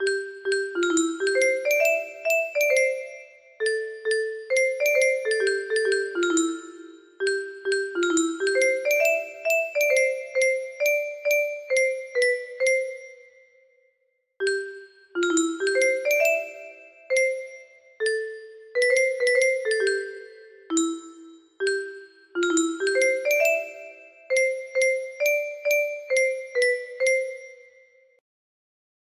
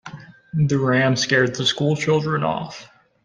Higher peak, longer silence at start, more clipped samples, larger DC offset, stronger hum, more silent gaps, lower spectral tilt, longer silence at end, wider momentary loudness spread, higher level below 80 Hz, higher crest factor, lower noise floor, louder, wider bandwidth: second, -10 dBFS vs -4 dBFS; about the same, 0 s vs 0.05 s; neither; neither; neither; neither; second, -0.5 dB/octave vs -5 dB/octave; first, 1.65 s vs 0.4 s; about the same, 13 LU vs 14 LU; second, -74 dBFS vs -54 dBFS; about the same, 16 dB vs 16 dB; first, -72 dBFS vs -40 dBFS; second, -24 LUFS vs -20 LUFS; first, 14.5 kHz vs 9.8 kHz